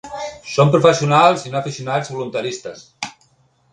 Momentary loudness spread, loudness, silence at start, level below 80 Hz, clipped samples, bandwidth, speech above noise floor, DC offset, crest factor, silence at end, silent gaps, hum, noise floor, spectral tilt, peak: 18 LU; -17 LUFS; 0.05 s; -56 dBFS; under 0.1%; 10 kHz; 42 dB; under 0.1%; 18 dB; 0.6 s; none; none; -58 dBFS; -5.5 dB/octave; 0 dBFS